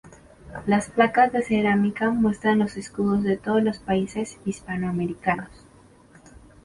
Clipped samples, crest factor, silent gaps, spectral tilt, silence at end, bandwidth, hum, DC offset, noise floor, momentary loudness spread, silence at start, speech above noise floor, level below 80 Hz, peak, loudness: under 0.1%; 18 dB; none; -6.5 dB/octave; 1.2 s; 11.5 kHz; none; under 0.1%; -52 dBFS; 10 LU; 0.45 s; 30 dB; -52 dBFS; -6 dBFS; -23 LUFS